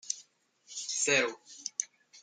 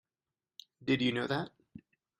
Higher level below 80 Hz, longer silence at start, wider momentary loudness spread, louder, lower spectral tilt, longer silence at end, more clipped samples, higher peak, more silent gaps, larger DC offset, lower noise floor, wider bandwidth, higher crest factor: second, -88 dBFS vs -72 dBFS; second, 0.05 s vs 0.8 s; second, 16 LU vs 24 LU; about the same, -32 LUFS vs -33 LUFS; second, -0.5 dB/octave vs -6 dB/octave; second, 0.05 s vs 0.4 s; neither; about the same, -14 dBFS vs -16 dBFS; neither; neither; second, -64 dBFS vs under -90 dBFS; second, 10.5 kHz vs 12 kHz; about the same, 22 dB vs 20 dB